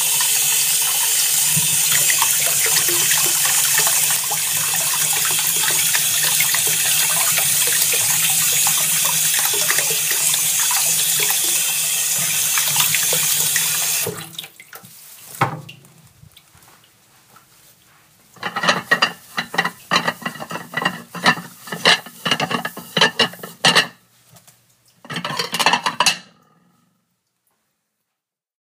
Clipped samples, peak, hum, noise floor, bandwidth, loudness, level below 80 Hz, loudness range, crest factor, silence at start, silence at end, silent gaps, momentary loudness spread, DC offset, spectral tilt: under 0.1%; 0 dBFS; none; -82 dBFS; 16 kHz; -15 LUFS; -66 dBFS; 10 LU; 20 dB; 0 s; 2.4 s; none; 10 LU; under 0.1%; 0 dB/octave